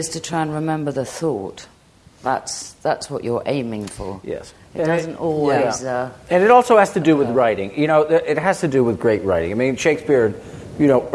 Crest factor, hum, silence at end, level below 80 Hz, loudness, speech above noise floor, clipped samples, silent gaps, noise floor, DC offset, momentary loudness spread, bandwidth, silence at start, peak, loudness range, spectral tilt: 18 dB; none; 0 s; -52 dBFS; -19 LUFS; 31 dB; under 0.1%; none; -50 dBFS; under 0.1%; 14 LU; 12 kHz; 0 s; 0 dBFS; 9 LU; -5.5 dB/octave